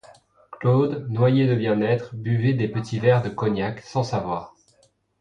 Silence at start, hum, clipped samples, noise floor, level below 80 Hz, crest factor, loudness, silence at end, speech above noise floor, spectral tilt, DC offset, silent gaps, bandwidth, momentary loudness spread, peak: 0.1 s; none; under 0.1%; -62 dBFS; -56 dBFS; 16 dB; -23 LUFS; 0.75 s; 41 dB; -8 dB/octave; under 0.1%; none; 7.6 kHz; 7 LU; -6 dBFS